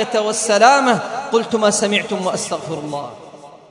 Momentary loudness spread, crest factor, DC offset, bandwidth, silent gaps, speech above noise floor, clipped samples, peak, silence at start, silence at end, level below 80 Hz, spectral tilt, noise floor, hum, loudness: 14 LU; 18 dB; under 0.1%; 11 kHz; none; 23 dB; under 0.1%; 0 dBFS; 0 s; 0.15 s; -64 dBFS; -3 dB/octave; -39 dBFS; none; -17 LUFS